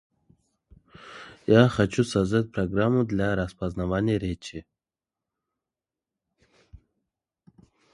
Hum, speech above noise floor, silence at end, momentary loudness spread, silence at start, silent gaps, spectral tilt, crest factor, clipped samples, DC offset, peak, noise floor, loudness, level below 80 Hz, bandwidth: none; over 66 dB; 1.15 s; 21 LU; 1 s; none; -7 dB/octave; 24 dB; under 0.1%; under 0.1%; -4 dBFS; under -90 dBFS; -25 LUFS; -48 dBFS; 11.5 kHz